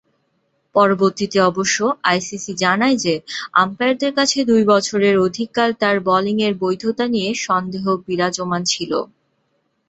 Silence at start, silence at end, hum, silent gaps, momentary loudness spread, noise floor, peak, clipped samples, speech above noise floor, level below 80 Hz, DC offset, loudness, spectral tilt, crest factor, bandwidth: 0.75 s; 0.85 s; none; none; 6 LU; -67 dBFS; -2 dBFS; under 0.1%; 49 dB; -60 dBFS; under 0.1%; -18 LUFS; -4 dB/octave; 16 dB; 8.2 kHz